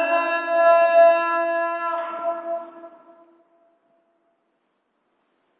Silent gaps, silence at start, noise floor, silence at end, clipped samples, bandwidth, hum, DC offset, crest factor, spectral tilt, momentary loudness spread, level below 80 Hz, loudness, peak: none; 0 s; -71 dBFS; 2.7 s; under 0.1%; 4.6 kHz; none; under 0.1%; 18 dB; -6.5 dB/octave; 15 LU; -76 dBFS; -20 LUFS; -4 dBFS